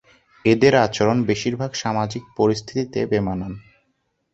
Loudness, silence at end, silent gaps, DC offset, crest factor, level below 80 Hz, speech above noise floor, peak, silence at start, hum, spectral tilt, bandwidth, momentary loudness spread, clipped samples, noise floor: -20 LUFS; 0.75 s; none; under 0.1%; 20 dB; -50 dBFS; 50 dB; -2 dBFS; 0.45 s; none; -5.5 dB/octave; 8 kHz; 11 LU; under 0.1%; -70 dBFS